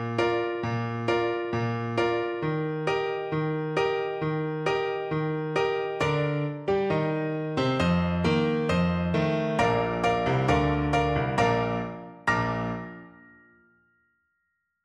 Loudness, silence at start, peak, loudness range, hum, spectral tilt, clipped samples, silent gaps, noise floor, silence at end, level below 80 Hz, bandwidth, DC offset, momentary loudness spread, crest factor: -27 LUFS; 0 s; -10 dBFS; 3 LU; none; -7 dB/octave; under 0.1%; none; -77 dBFS; 1.75 s; -46 dBFS; 10.5 kHz; under 0.1%; 5 LU; 16 dB